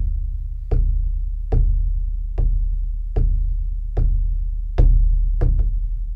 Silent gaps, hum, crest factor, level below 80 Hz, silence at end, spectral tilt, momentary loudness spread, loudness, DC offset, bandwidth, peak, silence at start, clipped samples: none; none; 16 dB; -18 dBFS; 0 s; -10.5 dB/octave; 8 LU; -24 LUFS; under 0.1%; 1.8 kHz; -2 dBFS; 0 s; under 0.1%